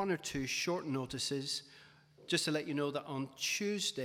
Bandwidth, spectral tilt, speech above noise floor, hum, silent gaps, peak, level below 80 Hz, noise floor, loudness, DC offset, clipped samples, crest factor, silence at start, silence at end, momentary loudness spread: over 20 kHz; -3.5 dB/octave; 24 dB; none; none; -20 dBFS; -68 dBFS; -61 dBFS; -36 LUFS; under 0.1%; under 0.1%; 18 dB; 0 s; 0 s; 6 LU